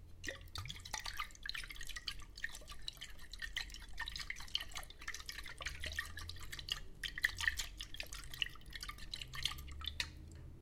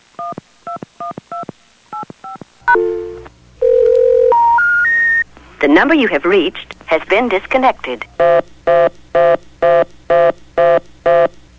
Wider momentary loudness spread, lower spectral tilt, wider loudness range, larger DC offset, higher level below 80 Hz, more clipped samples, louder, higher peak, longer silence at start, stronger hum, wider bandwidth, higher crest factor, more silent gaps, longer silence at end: second, 10 LU vs 18 LU; second, -1 dB/octave vs -6 dB/octave; second, 4 LU vs 7 LU; neither; second, -54 dBFS vs -46 dBFS; neither; second, -44 LUFS vs -13 LUFS; second, -18 dBFS vs 0 dBFS; second, 0 s vs 0.2 s; neither; first, 17 kHz vs 8 kHz; first, 28 dB vs 14 dB; neither; second, 0 s vs 0.3 s